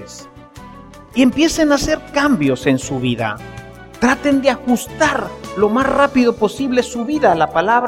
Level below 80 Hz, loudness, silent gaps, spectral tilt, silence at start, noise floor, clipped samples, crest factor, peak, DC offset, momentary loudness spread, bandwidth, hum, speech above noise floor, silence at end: -40 dBFS; -16 LUFS; none; -4.5 dB/octave; 0 s; -38 dBFS; under 0.1%; 16 dB; -2 dBFS; under 0.1%; 11 LU; 16 kHz; none; 22 dB; 0 s